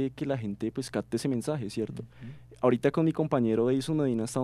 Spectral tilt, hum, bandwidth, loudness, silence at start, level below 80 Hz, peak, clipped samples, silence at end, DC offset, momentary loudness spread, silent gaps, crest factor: -7 dB/octave; none; 14.5 kHz; -29 LUFS; 0 s; -60 dBFS; -10 dBFS; under 0.1%; 0 s; under 0.1%; 11 LU; none; 18 dB